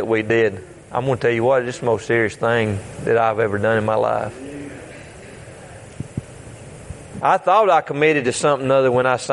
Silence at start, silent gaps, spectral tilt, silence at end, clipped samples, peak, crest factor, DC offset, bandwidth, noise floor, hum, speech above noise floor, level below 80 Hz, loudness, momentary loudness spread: 0 s; none; -5.5 dB/octave; 0 s; under 0.1%; -2 dBFS; 18 dB; under 0.1%; 11.5 kHz; -38 dBFS; none; 21 dB; -52 dBFS; -18 LUFS; 22 LU